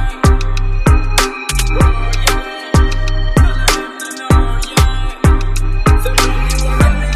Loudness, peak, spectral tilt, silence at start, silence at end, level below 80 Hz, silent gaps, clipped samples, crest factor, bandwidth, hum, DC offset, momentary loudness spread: -14 LUFS; 0 dBFS; -4.5 dB/octave; 0 s; 0 s; -14 dBFS; none; under 0.1%; 12 dB; 15.5 kHz; none; under 0.1%; 5 LU